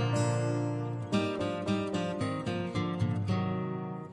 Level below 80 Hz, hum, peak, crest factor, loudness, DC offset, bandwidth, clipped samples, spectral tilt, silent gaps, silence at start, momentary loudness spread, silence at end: -62 dBFS; none; -18 dBFS; 14 dB; -32 LUFS; under 0.1%; 11.5 kHz; under 0.1%; -6.5 dB/octave; none; 0 s; 4 LU; 0 s